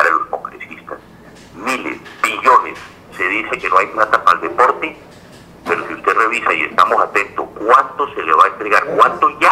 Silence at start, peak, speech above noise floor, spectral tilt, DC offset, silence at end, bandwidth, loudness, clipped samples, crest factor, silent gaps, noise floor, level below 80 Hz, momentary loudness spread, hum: 0 s; 0 dBFS; 26 dB; -3.5 dB/octave; under 0.1%; 0 s; 16 kHz; -14 LUFS; under 0.1%; 16 dB; none; -40 dBFS; -54 dBFS; 17 LU; none